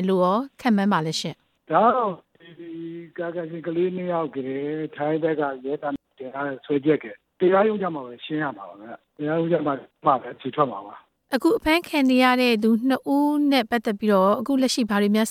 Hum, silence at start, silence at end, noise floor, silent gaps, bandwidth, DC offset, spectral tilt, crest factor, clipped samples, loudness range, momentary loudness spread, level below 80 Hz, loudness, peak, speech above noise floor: none; 0 s; 0 s; -41 dBFS; none; 15.5 kHz; under 0.1%; -5.5 dB/octave; 18 dB; under 0.1%; 7 LU; 16 LU; -58 dBFS; -23 LUFS; -6 dBFS; 19 dB